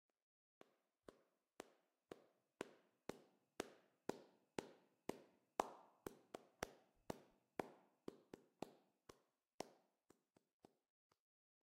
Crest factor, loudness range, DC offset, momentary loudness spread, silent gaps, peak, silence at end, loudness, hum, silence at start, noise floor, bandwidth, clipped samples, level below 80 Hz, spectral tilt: 34 dB; 9 LU; under 0.1%; 13 LU; 9.54-9.58 s; -24 dBFS; 1.95 s; -56 LUFS; none; 1.1 s; -80 dBFS; 15.5 kHz; under 0.1%; -84 dBFS; -4 dB/octave